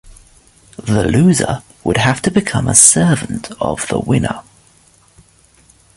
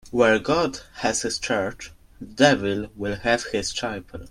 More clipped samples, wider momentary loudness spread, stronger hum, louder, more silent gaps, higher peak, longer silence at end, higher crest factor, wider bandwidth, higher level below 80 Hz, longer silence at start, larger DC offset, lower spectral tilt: first, 0.1% vs under 0.1%; about the same, 15 LU vs 17 LU; neither; first, -13 LUFS vs -23 LUFS; neither; about the same, 0 dBFS vs -2 dBFS; first, 1.55 s vs 0 s; second, 16 dB vs 22 dB; first, 16 kHz vs 14 kHz; first, -38 dBFS vs -48 dBFS; about the same, 0.05 s vs 0.05 s; neither; about the same, -4 dB/octave vs -3.5 dB/octave